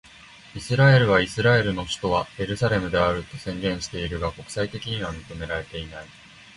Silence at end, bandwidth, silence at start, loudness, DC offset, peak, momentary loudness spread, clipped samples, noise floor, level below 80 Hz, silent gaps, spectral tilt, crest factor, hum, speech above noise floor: 0.45 s; 11.5 kHz; 0.3 s; -23 LUFS; under 0.1%; -4 dBFS; 17 LU; under 0.1%; -48 dBFS; -44 dBFS; none; -5.5 dB/octave; 20 dB; none; 24 dB